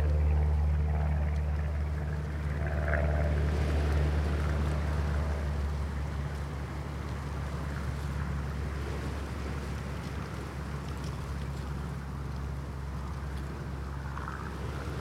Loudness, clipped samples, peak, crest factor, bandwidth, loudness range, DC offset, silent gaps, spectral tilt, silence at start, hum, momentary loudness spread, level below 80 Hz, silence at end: -34 LUFS; under 0.1%; -16 dBFS; 16 dB; 10.5 kHz; 7 LU; under 0.1%; none; -7 dB/octave; 0 s; none; 9 LU; -34 dBFS; 0 s